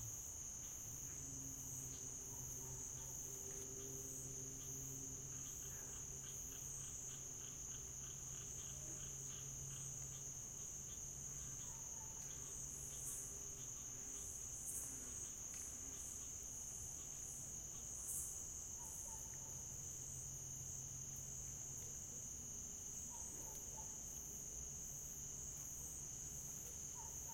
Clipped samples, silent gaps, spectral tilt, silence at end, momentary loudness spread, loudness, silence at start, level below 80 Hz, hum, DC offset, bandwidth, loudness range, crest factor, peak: under 0.1%; none; -2.5 dB/octave; 0 s; 1 LU; -48 LUFS; 0 s; -64 dBFS; none; under 0.1%; 16.5 kHz; 1 LU; 18 dB; -34 dBFS